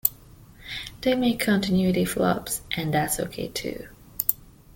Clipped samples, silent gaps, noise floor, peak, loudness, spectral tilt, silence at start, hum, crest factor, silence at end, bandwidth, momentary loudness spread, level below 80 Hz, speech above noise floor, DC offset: under 0.1%; none; -49 dBFS; 0 dBFS; -25 LUFS; -4.5 dB/octave; 0.05 s; none; 26 dB; 0.25 s; 17 kHz; 14 LU; -50 dBFS; 24 dB; under 0.1%